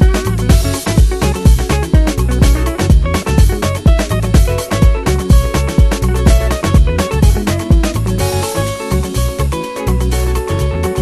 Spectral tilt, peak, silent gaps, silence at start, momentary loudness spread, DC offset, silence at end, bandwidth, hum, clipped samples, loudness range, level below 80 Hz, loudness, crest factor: -6 dB/octave; 0 dBFS; none; 0 s; 5 LU; under 0.1%; 0 s; 14 kHz; none; under 0.1%; 3 LU; -14 dBFS; -14 LUFS; 12 dB